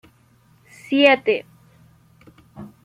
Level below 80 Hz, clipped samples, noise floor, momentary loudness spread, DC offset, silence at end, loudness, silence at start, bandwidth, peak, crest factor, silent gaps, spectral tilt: -66 dBFS; under 0.1%; -56 dBFS; 27 LU; under 0.1%; 0.2 s; -18 LUFS; 0.9 s; 11.5 kHz; -2 dBFS; 22 dB; none; -5 dB/octave